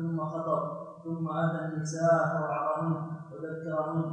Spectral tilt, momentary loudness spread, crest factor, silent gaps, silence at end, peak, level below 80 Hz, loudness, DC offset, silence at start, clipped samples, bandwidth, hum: -7.5 dB/octave; 13 LU; 16 dB; none; 0 s; -14 dBFS; -74 dBFS; -31 LUFS; under 0.1%; 0 s; under 0.1%; 8.8 kHz; none